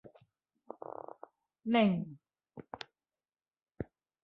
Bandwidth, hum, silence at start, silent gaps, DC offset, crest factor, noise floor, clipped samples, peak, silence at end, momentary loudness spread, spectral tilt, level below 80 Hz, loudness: 5.8 kHz; none; 0.05 s; none; under 0.1%; 24 dB; under -90 dBFS; under 0.1%; -16 dBFS; 0.4 s; 25 LU; -5 dB/octave; -68 dBFS; -35 LUFS